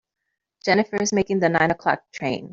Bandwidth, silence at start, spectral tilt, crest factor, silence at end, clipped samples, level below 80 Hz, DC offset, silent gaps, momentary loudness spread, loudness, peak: 7.6 kHz; 0.65 s; -4.5 dB/octave; 20 dB; 0 s; under 0.1%; -58 dBFS; under 0.1%; none; 8 LU; -22 LUFS; -4 dBFS